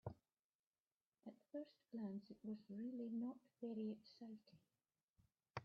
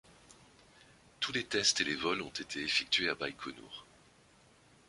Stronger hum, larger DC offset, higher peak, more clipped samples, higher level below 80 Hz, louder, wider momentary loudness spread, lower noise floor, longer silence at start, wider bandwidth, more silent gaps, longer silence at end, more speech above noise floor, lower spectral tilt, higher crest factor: neither; neither; second, -34 dBFS vs -16 dBFS; neither; second, -86 dBFS vs -68 dBFS; second, -53 LUFS vs -33 LUFS; second, 14 LU vs 17 LU; first, under -90 dBFS vs -64 dBFS; second, 0.05 s vs 0.3 s; second, 6.4 kHz vs 11.5 kHz; first, 0.39-0.73 s, 0.79-1.00 s, 1.07-1.12 s, 5.03-5.14 s vs none; second, 0 s vs 1.05 s; first, over 38 dB vs 29 dB; first, -7 dB/octave vs -1.5 dB/octave; about the same, 20 dB vs 22 dB